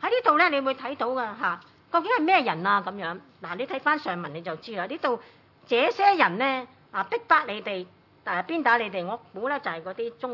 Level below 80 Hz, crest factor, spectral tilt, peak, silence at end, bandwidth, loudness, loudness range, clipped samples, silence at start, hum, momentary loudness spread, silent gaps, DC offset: -78 dBFS; 20 dB; -6 dB/octave; -6 dBFS; 0 s; 6 kHz; -26 LUFS; 3 LU; under 0.1%; 0 s; none; 14 LU; none; under 0.1%